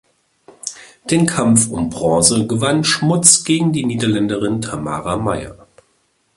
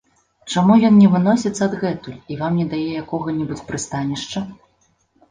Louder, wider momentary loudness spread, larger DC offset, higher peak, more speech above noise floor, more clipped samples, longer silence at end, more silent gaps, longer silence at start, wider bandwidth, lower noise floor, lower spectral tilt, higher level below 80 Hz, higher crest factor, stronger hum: first, -15 LUFS vs -18 LUFS; first, 18 LU vs 15 LU; neither; about the same, 0 dBFS vs -2 dBFS; about the same, 46 dB vs 45 dB; neither; about the same, 0.85 s vs 0.75 s; neither; first, 0.65 s vs 0.45 s; first, 16 kHz vs 9.6 kHz; about the same, -62 dBFS vs -62 dBFS; second, -4 dB/octave vs -6.5 dB/octave; first, -46 dBFS vs -54 dBFS; about the same, 18 dB vs 16 dB; neither